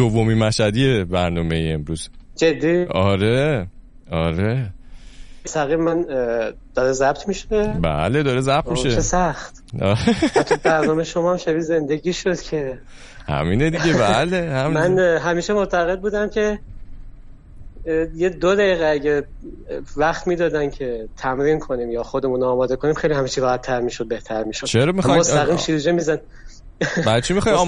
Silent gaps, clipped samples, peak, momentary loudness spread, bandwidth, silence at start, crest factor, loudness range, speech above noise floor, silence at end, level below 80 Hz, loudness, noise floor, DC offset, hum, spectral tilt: none; under 0.1%; -2 dBFS; 9 LU; 11.5 kHz; 0 s; 16 dB; 3 LU; 20 dB; 0 s; -36 dBFS; -20 LUFS; -39 dBFS; under 0.1%; none; -5.5 dB/octave